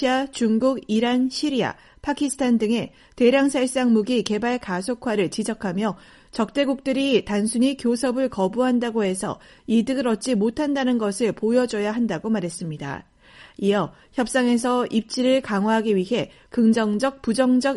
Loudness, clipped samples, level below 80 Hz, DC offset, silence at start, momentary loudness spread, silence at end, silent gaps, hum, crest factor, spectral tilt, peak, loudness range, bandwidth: -22 LUFS; under 0.1%; -56 dBFS; under 0.1%; 0 s; 8 LU; 0 s; none; none; 16 dB; -5 dB/octave; -6 dBFS; 3 LU; 11.5 kHz